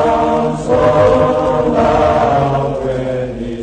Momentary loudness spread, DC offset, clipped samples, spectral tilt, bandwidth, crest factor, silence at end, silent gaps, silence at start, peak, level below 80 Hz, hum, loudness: 8 LU; under 0.1%; under 0.1%; -7 dB/octave; 9.4 kHz; 12 dB; 0 s; none; 0 s; 0 dBFS; -32 dBFS; none; -13 LUFS